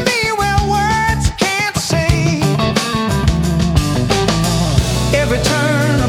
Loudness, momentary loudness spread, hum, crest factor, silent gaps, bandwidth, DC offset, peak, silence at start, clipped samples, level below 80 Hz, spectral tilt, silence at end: -15 LUFS; 2 LU; none; 14 dB; none; 17 kHz; under 0.1%; 0 dBFS; 0 s; under 0.1%; -24 dBFS; -5 dB/octave; 0 s